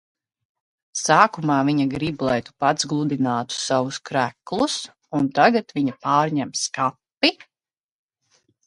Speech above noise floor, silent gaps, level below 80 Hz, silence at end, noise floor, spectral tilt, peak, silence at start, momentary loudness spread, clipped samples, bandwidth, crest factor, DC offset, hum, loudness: over 69 dB; 7.17-7.21 s; -60 dBFS; 1.35 s; under -90 dBFS; -4 dB/octave; 0 dBFS; 0.95 s; 8 LU; under 0.1%; 11.5 kHz; 22 dB; under 0.1%; none; -21 LUFS